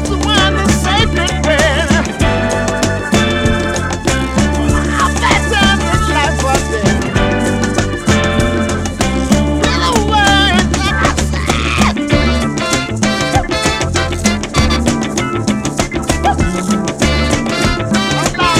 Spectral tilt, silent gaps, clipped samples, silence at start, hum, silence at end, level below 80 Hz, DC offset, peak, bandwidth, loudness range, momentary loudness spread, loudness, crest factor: -4.5 dB/octave; none; under 0.1%; 0 s; none; 0 s; -22 dBFS; 0.3%; 0 dBFS; 15 kHz; 2 LU; 5 LU; -13 LUFS; 12 dB